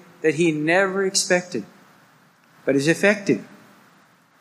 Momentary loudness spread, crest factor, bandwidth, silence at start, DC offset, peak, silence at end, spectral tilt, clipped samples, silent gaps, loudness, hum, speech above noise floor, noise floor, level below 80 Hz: 9 LU; 20 dB; 15.5 kHz; 0.25 s; under 0.1%; -4 dBFS; 0.95 s; -4 dB/octave; under 0.1%; none; -20 LUFS; none; 36 dB; -56 dBFS; -72 dBFS